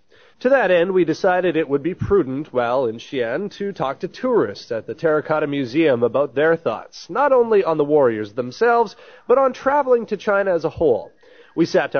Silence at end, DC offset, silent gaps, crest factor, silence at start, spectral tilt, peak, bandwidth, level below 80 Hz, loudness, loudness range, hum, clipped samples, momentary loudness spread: 0 s; 0.2%; none; 14 dB; 0.4 s; -4.5 dB/octave; -4 dBFS; 6.6 kHz; -52 dBFS; -19 LUFS; 4 LU; none; under 0.1%; 9 LU